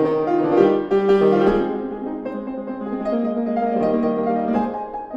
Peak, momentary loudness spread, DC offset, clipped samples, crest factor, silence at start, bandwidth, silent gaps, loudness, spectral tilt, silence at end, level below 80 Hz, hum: -2 dBFS; 12 LU; under 0.1%; under 0.1%; 18 dB; 0 s; 7 kHz; none; -20 LUFS; -8.5 dB/octave; 0 s; -48 dBFS; none